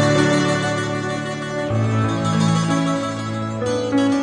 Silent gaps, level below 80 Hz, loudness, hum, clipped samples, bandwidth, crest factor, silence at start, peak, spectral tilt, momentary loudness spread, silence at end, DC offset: none; -50 dBFS; -20 LUFS; none; under 0.1%; 10.5 kHz; 16 dB; 0 s; -4 dBFS; -5.5 dB/octave; 8 LU; 0 s; under 0.1%